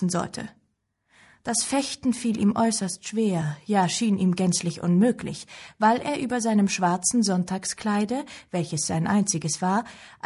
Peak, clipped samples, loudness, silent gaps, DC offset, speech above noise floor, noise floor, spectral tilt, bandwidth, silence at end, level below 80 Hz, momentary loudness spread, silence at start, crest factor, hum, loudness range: -10 dBFS; under 0.1%; -24 LUFS; none; under 0.1%; 48 dB; -73 dBFS; -4.5 dB/octave; 11.5 kHz; 0.15 s; -60 dBFS; 10 LU; 0 s; 16 dB; none; 3 LU